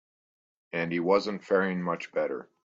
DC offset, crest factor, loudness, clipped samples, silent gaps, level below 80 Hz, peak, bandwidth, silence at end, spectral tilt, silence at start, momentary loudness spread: under 0.1%; 20 dB; -29 LUFS; under 0.1%; none; -72 dBFS; -10 dBFS; 7.6 kHz; 0.2 s; -6.5 dB/octave; 0.75 s; 8 LU